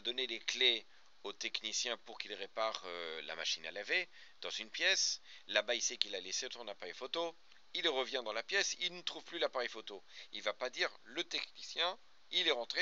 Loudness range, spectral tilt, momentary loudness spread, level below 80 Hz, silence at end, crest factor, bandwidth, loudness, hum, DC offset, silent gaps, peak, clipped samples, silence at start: 4 LU; 2.5 dB/octave; 13 LU; -88 dBFS; 0 s; 28 dB; 7.6 kHz; -37 LUFS; none; 0.1%; none; -12 dBFS; under 0.1%; 0.05 s